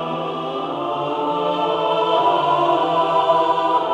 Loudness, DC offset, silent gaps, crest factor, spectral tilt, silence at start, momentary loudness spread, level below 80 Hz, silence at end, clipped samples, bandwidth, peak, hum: -19 LUFS; under 0.1%; none; 14 dB; -6 dB/octave; 0 s; 8 LU; -64 dBFS; 0 s; under 0.1%; 9.6 kHz; -4 dBFS; none